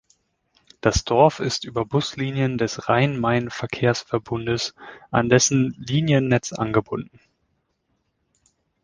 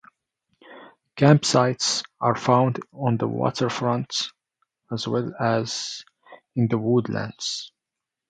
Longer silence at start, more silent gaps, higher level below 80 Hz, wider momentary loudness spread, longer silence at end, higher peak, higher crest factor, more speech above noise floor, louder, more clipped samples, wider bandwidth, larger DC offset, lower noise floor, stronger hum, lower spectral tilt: first, 0.85 s vs 0.7 s; neither; first, -44 dBFS vs -64 dBFS; second, 9 LU vs 14 LU; first, 1.8 s vs 0.6 s; about the same, -2 dBFS vs -2 dBFS; about the same, 20 dB vs 22 dB; second, 50 dB vs 63 dB; about the same, -22 LUFS vs -23 LUFS; neither; about the same, 10 kHz vs 9.4 kHz; neither; second, -72 dBFS vs -86 dBFS; neither; about the same, -5 dB/octave vs -5 dB/octave